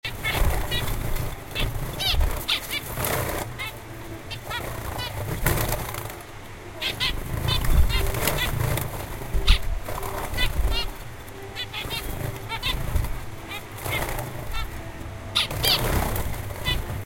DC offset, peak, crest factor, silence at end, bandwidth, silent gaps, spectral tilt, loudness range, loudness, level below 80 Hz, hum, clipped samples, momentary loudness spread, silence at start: under 0.1%; 0 dBFS; 24 dB; 0 s; 17 kHz; none; -3.5 dB/octave; 4 LU; -27 LUFS; -30 dBFS; none; under 0.1%; 12 LU; 0.05 s